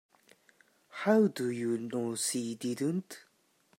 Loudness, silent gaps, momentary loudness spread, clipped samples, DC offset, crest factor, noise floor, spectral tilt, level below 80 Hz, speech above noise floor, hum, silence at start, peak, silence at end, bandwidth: -32 LUFS; none; 17 LU; under 0.1%; under 0.1%; 20 dB; -70 dBFS; -4.5 dB/octave; -84 dBFS; 39 dB; none; 0.95 s; -14 dBFS; 0.6 s; 16 kHz